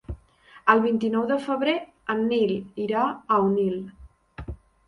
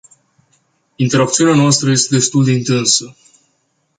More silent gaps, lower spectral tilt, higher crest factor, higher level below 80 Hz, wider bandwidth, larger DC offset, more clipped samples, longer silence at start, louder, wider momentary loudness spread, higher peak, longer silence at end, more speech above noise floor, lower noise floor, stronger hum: neither; first, -7.5 dB/octave vs -4 dB/octave; first, 22 dB vs 16 dB; first, -48 dBFS vs -54 dBFS; about the same, 10.5 kHz vs 9.6 kHz; neither; neither; second, 0.1 s vs 1 s; second, -24 LUFS vs -13 LUFS; first, 20 LU vs 4 LU; second, -4 dBFS vs 0 dBFS; second, 0.3 s vs 0.85 s; second, 30 dB vs 51 dB; second, -53 dBFS vs -64 dBFS; neither